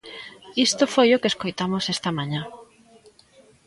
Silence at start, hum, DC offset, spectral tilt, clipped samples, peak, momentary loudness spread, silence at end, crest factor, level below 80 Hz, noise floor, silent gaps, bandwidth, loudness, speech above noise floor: 0.05 s; none; under 0.1%; -4 dB/octave; under 0.1%; -6 dBFS; 17 LU; 1.05 s; 20 dB; -62 dBFS; -55 dBFS; none; 11.5 kHz; -22 LUFS; 33 dB